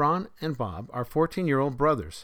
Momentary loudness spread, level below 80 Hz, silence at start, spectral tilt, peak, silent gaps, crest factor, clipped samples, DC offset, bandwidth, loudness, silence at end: 9 LU; -50 dBFS; 0 s; -7.5 dB/octave; -12 dBFS; none; 16 dB; under 0.1%; under 0.1%; over 20 kHz; -27 LUFS; 0 s